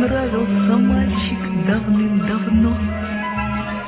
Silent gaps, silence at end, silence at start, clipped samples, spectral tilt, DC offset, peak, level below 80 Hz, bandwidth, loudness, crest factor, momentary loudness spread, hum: none; 0 s; 0 s; under 0.1%; -11.5 dB/octave; under 0.1%; -6 dBFS; -30 dBFS; 4 kHz; -19 LUFS; 12 dB; 7 LU; none